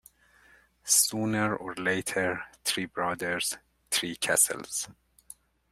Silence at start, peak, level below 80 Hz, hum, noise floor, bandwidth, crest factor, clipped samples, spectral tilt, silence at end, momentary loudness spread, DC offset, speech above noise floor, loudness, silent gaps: 0.85 s; -8 dBFS; -66 dBFS; none; -61 dBFS; 16 kHz; 22 dB; under 0.1%; -2 dB/octave; 0.8 s; 11 LU; under 0.1%; 30 dB; -27 LUFS; none